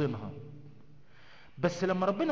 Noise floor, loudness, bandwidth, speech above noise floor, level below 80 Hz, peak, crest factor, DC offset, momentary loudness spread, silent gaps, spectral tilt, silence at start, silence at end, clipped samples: -58 dBFS; -32 LUFS; 7.8 kHz; 28 dB; -64 dBFS; -14 dBFS; 20 dB; 0.3%; 22 LU; none; -6.5 dB/octave; 0 s; 0 s; under 0.1%